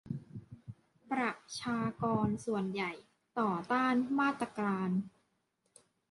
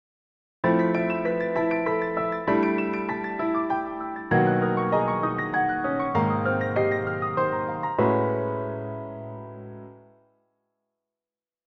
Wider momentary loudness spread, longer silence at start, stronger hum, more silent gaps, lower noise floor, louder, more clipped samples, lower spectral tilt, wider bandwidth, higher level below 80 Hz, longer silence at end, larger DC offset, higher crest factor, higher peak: first, 19 LU vs 12 LU; second, 0.05 s vs 0.65 s; neither; neither; second, -79 dBFS vs under -90 dBFS; second, -35 LUFS vs -25 LUFS; neither; second, -6 dB/octave vs -9.5 dB/octave; first, 11.5 kHz vs 6.2 kHz; second, -68 dBFS vs -58 dBFS; second, 1 s vs 1.7 s; neither; about the same, 18 dB vs 18 dB; second, -18 dBFS vs -8 dBFS